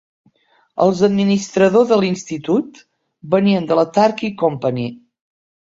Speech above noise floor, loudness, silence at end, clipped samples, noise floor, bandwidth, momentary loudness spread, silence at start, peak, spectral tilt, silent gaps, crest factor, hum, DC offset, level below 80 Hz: 41 dB; -16 LUFS; 0.8 s; under 0.1%; -57 dBFS; 7.8 kHz; 10 LU; 0.75 s; -2 dBFS; -6.5 dB/octave; none; 16 dB; none; under 0.1%; -58 dBFS